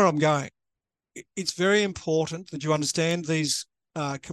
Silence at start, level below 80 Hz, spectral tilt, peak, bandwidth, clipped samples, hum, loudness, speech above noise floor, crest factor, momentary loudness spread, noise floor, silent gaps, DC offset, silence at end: 0 s; -64 dBFS; -4 dB/octave; -8 dBFS; 12.5 kHz; under 0.1%; none; -26 LUFS; 61 dB; 18 dB; 13 LU; -87 dBFS; none; under 0.1%; 0 s